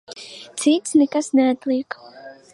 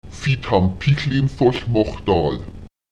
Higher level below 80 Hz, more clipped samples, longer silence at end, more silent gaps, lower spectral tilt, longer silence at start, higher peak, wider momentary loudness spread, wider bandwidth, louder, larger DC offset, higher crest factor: second, -72 dBFS vs -36 dBFS; neither; about the same, 0.2 s vs 0.25 s; neither; second, -3 dB/octave vs -7.5 dB/octave; about the same, 0.1 s vs 0.05 s; second, -6 dBFS vs -2 dBFS; first, 18 LU vs 6 LU; first, 11.5 kHz vs 9 kHz; about the same, -19 LUFS vs -19 LUFS; second, under 0.1% vs 0.6%; about the same, 16 dB vs 18 dB